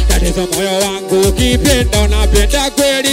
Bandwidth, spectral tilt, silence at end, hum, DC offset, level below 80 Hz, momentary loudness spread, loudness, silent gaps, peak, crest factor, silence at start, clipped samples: 16.5 kHz; -4 dB/octave; 0 s; none; under 0.1%; -16 dBFS; 3 LU; -12 LUFS; none; 0 dBFS; 12 dB; 0 s; under 0.1%